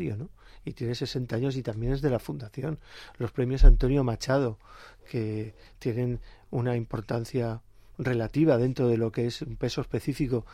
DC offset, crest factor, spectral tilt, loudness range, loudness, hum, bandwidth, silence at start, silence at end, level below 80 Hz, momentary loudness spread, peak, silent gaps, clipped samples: under 0.1%; 22 dB; -7.5 dB/octave; 4 LU; -29 LUFS; none; 10 kHz; 0 s; 0.05 s; -30 dBFS; 14 LU; -4 dBFS; none; under 0.1%